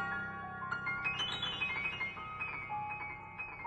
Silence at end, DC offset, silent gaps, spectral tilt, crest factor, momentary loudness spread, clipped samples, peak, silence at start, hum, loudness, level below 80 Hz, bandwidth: 0 s; under 0.1%; none; -3.5 dB/octave; 16 dB; 8 LU; under 0.1%; -24 dBFS; 0 s; none; -38 LUFS; -62 dBFS; 10 kHz